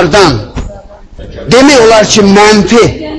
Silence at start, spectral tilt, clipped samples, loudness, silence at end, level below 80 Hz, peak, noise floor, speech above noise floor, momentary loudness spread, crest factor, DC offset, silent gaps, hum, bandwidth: 0 s; -4 dB/octave; 6%; -4 LUFS; 0 s; -26 dBFS; 0 dBFS; -28 dBFS; 24 dB; 19 LU; 6 dB; under 0.1%; none; none; 11 kHz